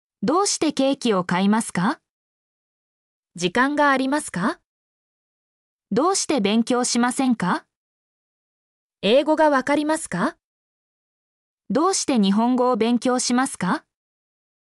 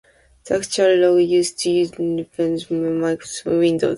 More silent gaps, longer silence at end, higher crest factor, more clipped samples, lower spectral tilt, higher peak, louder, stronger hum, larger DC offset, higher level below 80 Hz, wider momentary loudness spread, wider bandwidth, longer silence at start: first, 2.10-3.23 s, 4.65-5.79 s, 7.76-8.90 s, 10.44-11.58 s vs none; first, 0.85 s vs 0 s; about the same, 16 dB vs 14 dB; neither; about the same, -4 dB/octave vs -5 dB/octave; about the same, -6 dBFS vs -4 dBFS; about the same, -21 LUFS vs -19 LUFS; neither; neither; second, -64 dBFS vs -56 dBFS; about the same, 8 LU vs 9 LU; about the same, 12 kHz vs 11.5 kHz; second, 0.2 s vs 0.45 s